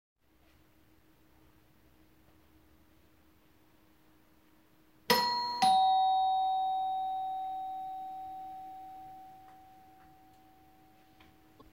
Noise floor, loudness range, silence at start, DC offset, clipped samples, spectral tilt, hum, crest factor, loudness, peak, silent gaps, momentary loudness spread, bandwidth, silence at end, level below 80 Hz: -66 dBFS; 19 LU; 5.1 s; under 0.1%; under 0.1%; -2 dB/octave; none; 26 dB; -31 LUFS; -10 dBFS; none; 24 LU; 16 kHz; 2.15 s; -72 dBFS